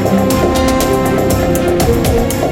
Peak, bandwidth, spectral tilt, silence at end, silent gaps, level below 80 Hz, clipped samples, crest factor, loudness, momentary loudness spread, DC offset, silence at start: 0 dBFS; 17.5 kHz; -5.5 dB/octave; 0 s; none; -24 dBFS; under 0.1%; 12 dB; -13 LUFS; 1 LU; under 0.1%; 0 s